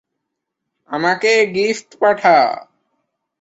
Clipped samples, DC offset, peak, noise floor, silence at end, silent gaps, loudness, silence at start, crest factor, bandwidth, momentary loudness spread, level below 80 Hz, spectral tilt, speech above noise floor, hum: under 0.1%; under 0.1%; -2 dBFS; -78 dBFS; 0.8 s; none; -15 LUFS; 0.9 s; 16 dB; 8 kHz; 9 LU; -64 dBFS; -3.5 dB/octave; 63 dB; none